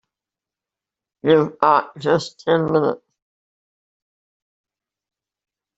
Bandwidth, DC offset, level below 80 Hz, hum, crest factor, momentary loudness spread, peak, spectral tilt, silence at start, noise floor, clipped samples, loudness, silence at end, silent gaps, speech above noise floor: 8 kHz; under 0.1%; -62 dBFS; none; 22 dB; 7 LU; 0 dBFS; -6.5 dB/octave; 1.25 s; -88 dBFS; under 0.1%; -19 LUFS; 2.8 s; none; 71 dB